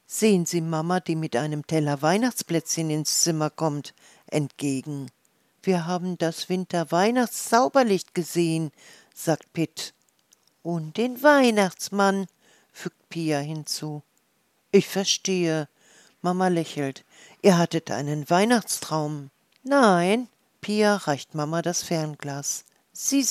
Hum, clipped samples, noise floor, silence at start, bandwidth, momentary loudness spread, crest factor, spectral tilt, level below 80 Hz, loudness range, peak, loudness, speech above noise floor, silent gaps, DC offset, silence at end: none; under 0.1%; -68 dBFS; 0.1 s; 15.5 kHz; 15 LU; 20 dB; -4.5 dB/octave; -78 dBFS; 4 LU; -4 dBFS; -24 LUFS; 45 dB; none; under 0.1%; 0 s